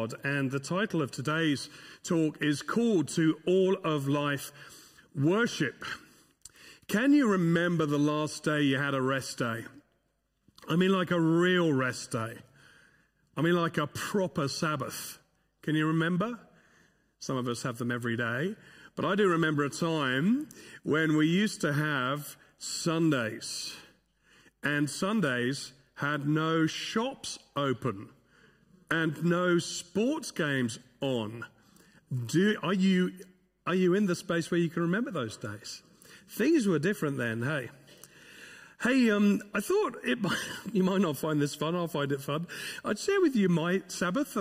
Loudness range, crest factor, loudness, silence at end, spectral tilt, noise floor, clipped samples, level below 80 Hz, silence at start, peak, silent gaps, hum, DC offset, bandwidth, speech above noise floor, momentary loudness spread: 4 LU; 16 dB; -29 LUFS; 0 s; -5.5 dB/octave; -76 dBFS; under 0.1%; -70 dBFS; 0 s; -14 dBFS; none; none; under 0.1%; 16 kHz; 47 dB; 14 LU